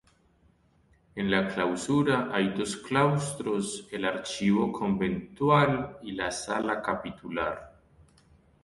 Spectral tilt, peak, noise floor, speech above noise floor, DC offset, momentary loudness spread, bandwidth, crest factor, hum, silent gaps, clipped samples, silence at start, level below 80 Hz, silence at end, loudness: -5.5 dB/octave; -8 dBFS; -64 dBFS; 37 dB; under 0.1%; 9 LU; 11.5 kHz; 20 dB; none; none; under 0.1%; 1.15 s; -58 dBFS; 0.95 s; -28 LUFS